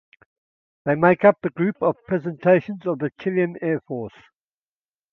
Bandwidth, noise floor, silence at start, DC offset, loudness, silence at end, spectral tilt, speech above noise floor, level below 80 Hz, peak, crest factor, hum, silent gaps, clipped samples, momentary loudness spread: 5.8 kHz; under -90 dBFS; 0.85 s; under 0.1%; -21 LUFS; 1.05 s; -10 dB/octave; over 69 dB; -64 dBFS; 0 dBFS; 22 dB; none; none; under 0.1%; 12 LU